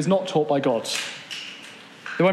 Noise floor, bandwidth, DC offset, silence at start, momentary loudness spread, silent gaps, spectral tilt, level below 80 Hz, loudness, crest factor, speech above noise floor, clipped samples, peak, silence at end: -43 dBFS; 13.5 kHz; under 0.1%; 0 s; 17 LU; none; -4.5 dB/octave; -80 dBFS; -24 LUFS; 16 dB; 21 dB; under 0.1%; -8 dBFS; 0 s